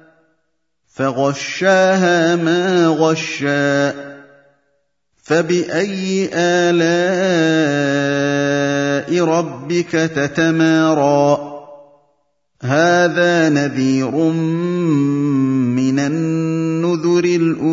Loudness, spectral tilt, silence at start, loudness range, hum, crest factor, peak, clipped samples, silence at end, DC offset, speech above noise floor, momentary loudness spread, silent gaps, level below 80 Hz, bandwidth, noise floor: -16 LUFS; -5.5 dB/octave; 1 s; 3 LU; none; 14 dB; 0 dBFS; under 0.1%; 0 s; under 0.1%; 56 dB; 6 LU; none; -62 dBFS; 7.8 kHz; -71 dBFS